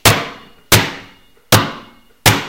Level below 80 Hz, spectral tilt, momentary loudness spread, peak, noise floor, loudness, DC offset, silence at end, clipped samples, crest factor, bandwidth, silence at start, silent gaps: -36 dBFS; -3 dB/octave; 18 LU; 0 dBFS; -45 dBFS; -14 LUFS; under 0.1%; 0 s; 0.2%; 16 dB; over 20 kHz; 0.05 s; none